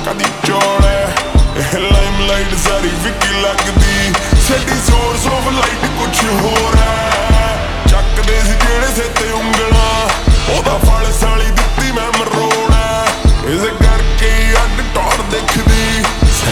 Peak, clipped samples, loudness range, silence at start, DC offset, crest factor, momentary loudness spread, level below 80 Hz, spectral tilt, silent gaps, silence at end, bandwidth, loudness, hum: 0 dBFS; under 0.1%; 1 LU; 0 s; under 0.1%; 12 dB; 3 LU; -14 dBFS; -4 dB/octave; none; 0 s; 19 kHz; -13 LUFS; none